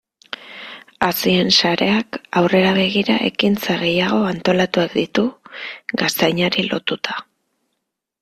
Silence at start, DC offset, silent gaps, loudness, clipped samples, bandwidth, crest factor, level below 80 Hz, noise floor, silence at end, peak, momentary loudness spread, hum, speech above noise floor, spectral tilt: 0.4 s; under 0.1%; none; -17 LUFS; under 0.1%; 15.5 kHz; 18 dB; -56 dBFS; -76 dBFS; 1 s; -2 dBFS; 17 LU; none; 59 dB; -4.5 dB/octave